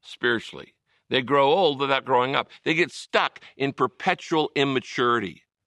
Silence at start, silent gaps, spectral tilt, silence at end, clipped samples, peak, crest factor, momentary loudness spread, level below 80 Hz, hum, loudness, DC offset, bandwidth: 0.05 s; none; -5 dB/octave; 0.3 s; under 0.1%; -4 dBFS; 20 dB; 9 LU; -70 dBFS; none; -23 LUFS; under 0.1%; 11.5 kHz